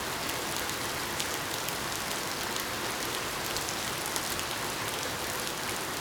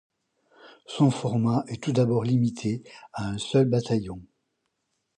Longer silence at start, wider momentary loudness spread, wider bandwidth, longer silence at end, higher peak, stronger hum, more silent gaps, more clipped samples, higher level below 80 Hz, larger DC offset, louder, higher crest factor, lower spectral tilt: second, 0 s vs 0.65 s; second, 1 LU vs 14 LU; first, over 20 kHz vs 9.8 kHz; second, 0 s vs 0.9 s; about the same, -6 dBFS vs -8 dBFS; neither; neither; neither; about the same, -56 dBFS vs -58 dBFS; neither; second, -32 LUFS vs -25 LUFS; first, 28 dB vs 18 dB; second, -1.5 dB/octave vs -7 dB/octave